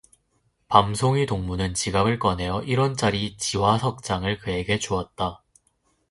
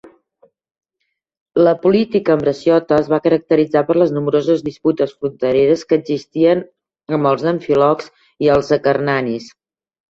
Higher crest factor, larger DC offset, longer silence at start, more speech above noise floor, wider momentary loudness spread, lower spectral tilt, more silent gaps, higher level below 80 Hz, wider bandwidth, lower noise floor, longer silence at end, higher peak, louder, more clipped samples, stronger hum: first, 24 dB vs 14 dB; neither; first, 0.7 s vs 0.05 s; second, 46 dB vs 59 dB; about the same, 7 LU vs 6 LU; second, -5 dB/octave vs -7.5 dB/octave; second, none vs 1.41-1.46 s; first, -44 dBFS vs -54 dBFS; first, 11.5 kHz vs 7.6 kHz; second, -69 dBFS vs -74 dBFS; first, 0.75 s vs 0.6 s; about the same, 0 dBFS vs -2 dBFS; second, -24 LUFS vs -16 LUFS; neither; neither